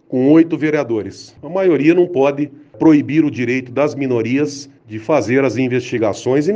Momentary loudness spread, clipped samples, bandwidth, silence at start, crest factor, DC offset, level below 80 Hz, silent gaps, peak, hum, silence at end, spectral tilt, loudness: 12 LU; under 0.1%; 7.8 kHz; 0.1 s; 16 dB; under 0.1%; -60 dBFS; none; 0 dBFS; none; 0 s; -7 dB/octave; -16 LUFS